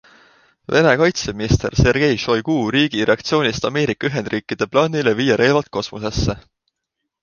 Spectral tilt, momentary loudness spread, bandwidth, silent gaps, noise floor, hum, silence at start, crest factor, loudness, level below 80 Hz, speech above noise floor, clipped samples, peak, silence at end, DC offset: -5.5 dB/octave; 9 LU; 7.2 kHz; none; -78 dBFS; none; 0.7 s; 18 dB; -18 LUFS; -36 dBFS; 61 dB; under 0.1%; 0 dBFS; 0.8 s; under 0.1%